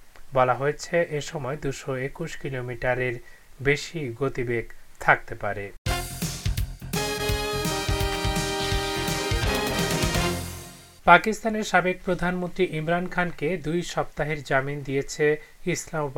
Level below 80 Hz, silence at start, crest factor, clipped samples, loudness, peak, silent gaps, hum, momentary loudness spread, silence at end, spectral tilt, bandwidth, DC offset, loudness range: -38 dBFS; 0 s; 26 dB; under 0.1%; -26 LUFS; 0 dBFS; 5.78-5.85 s; none; 9 LU; 0 s; -4.5 dB/octave; 18 kHz; under 0.1%; 5 LU